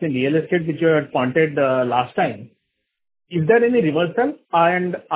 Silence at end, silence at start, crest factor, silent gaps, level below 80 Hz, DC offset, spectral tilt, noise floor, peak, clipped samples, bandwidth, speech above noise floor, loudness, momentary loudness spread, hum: 0 s; 0 s; 16 dB; none; -60 dBFS; under 0.1%; -10.5 dB/octave; -75 dBFS; -4 dBFS; under 0.1%; 4 kHz; 56 dB; -19 LUFS; 7 LU; none